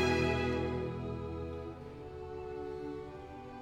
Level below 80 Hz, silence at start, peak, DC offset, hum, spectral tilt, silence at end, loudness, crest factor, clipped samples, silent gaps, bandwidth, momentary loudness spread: -50 dBFS; 0 s; -18 dBFS; under 0.1%; none; -6.5 dB/octave; 0 s; -38 LUFS; 18 dB; under 0.1%; none; 15 kHz; 15 LU